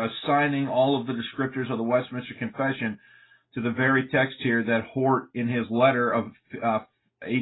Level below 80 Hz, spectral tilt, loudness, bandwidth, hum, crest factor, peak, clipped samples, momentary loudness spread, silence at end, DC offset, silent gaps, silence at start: -66 dBFS; -10.5 dB/octave; -25 LUFS; 4.1 kHz; none; 18 dB; -8 dBFS; under 0.1%; 11 LU; 0 s; under 0.1%; none; 0 s